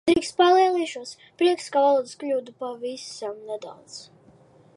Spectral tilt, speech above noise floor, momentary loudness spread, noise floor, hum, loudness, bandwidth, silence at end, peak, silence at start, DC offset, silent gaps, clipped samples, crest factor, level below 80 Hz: -3.5 dB/octave; 30 dB; 21 LU; -54 dBFS; none; -23 LUFS; 11.5 kHz; 0.75 s; -6 dBFS; 0.05 s; under 0.1%; none; under 0.1%; 18 dB; -62 dBFS